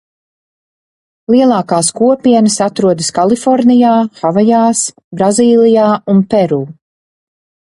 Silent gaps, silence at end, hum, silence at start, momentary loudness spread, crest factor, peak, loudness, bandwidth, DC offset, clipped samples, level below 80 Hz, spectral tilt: 5.04-5.11 s; 1.05 s; none; 1.3 s; 7 LU; 12 dB; 0 dBFS; -10 LUFS; 11.5 kHz; under 0.1%; under 0.1%; -54 dBFS; -5 dB/octave